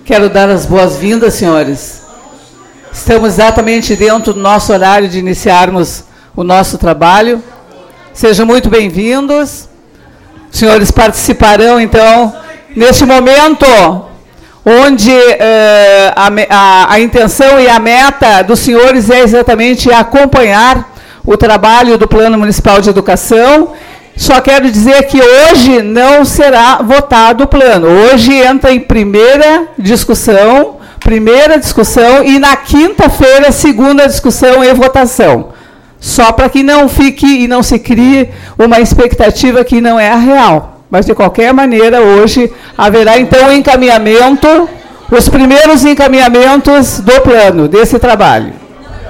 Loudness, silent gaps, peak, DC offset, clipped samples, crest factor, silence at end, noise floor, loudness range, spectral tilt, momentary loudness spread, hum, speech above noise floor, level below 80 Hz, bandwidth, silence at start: -5 LUFS; none; 0 dBFS; under 0.1%; 9%; 6 dB; 0 s; -37 dBFS; 5 LU; -4.5 dB/octave; 7 LU; none; 33 dB; -22 dBFS; 17 kHz; 0.05 s